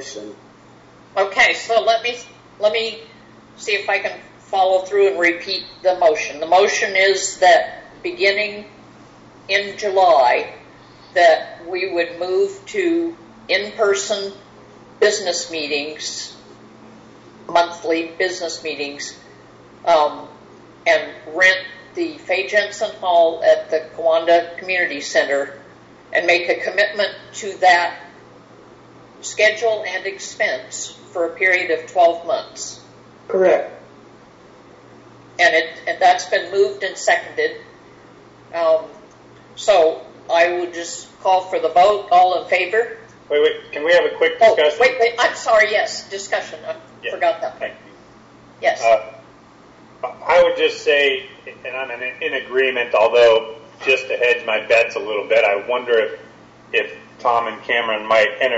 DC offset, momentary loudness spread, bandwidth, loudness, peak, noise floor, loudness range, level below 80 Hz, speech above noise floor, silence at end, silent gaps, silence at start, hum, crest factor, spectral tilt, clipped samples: under 0.1%; 15 LU; 8 kHz; -18 LUFS; -4 dBFS; -46 dBFS; 6 LU; -60 dBFS; 28 dB; 0 s; none; 0 s; none; 14 dB; -2 dB/octave; under 0.1%